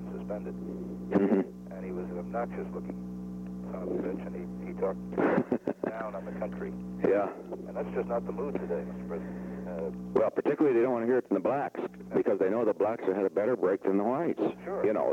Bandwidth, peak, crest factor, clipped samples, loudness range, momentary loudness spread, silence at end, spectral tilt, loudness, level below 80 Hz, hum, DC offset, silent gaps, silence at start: 8.6 kHz; -12 dBFS; 18 dB; under 0.1%; 6 LU; 11 LU; 0 s; -9 dB/octave; -31 LUFS; -58 dBFS; none; under 0.1%; none; 0 s